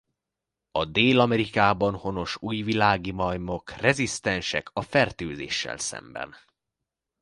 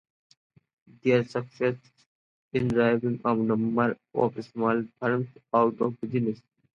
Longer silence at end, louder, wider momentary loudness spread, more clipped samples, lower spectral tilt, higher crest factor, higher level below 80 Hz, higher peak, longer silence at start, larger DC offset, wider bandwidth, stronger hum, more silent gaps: first, 0.9 s vs 0.4 s; about the same, -25 LUFS vs -27 LUFS; first, 11 LU vs 7 LU; neither; second, -4.5 dB/octave vs -8.5 dB/octave; about the same, 22 dB vs 18 dB; first, -50 dBFS vs -64 dBFS; first, -4 dBFS vs -10 dBFS; second, 0.75 s vs 1.05 s; neither; first, 11.5 kHz vs 7.2 kHz; neither; second, none vs 2.06-2.51 s